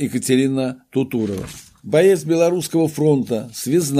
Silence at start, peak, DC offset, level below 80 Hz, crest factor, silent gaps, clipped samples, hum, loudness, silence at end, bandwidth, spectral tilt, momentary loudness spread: 0 s; -4 dBFS; under 0.1%; -56 dBFS; 14 dB; none; under 0.1%; none; -18 LUFS; 0 s; 15.5 kHz; -5.5 dB/octave; 10 LU